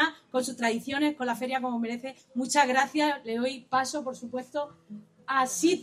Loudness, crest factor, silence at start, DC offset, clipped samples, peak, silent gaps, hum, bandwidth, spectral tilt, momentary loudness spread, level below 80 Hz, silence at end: -29 LUFS; 18 dB; 0 s; under 0.1%; under 0.1%; -10 dBFS; none; none; 15 kHz; -2.5 dB/octave; 12 LU; -76 dBFS; 0 s